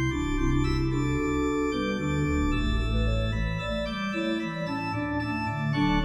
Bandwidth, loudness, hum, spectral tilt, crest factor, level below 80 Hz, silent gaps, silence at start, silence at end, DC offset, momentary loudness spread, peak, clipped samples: 11 kHz; -28 LUFS; none; -6.5 dB/octave; 14 dB; -32 dBFS; none; 0 s; 0 s; under 0.1%; 4 LU; -14 dBFS; under 0.1%